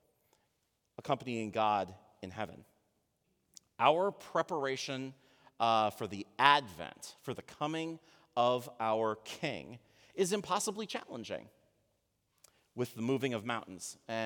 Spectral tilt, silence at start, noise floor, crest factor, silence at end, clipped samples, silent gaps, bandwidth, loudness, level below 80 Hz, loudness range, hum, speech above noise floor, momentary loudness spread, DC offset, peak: -4 dB/octave; 1 s; -80 dBFS; 28 dB; 0 s; under 0.1%; none; over 20 kHz; -34 LUFS; -80 dBFS; 6 LU; none; 46 dB; 17 LU; under 0.1%; -8 dBFS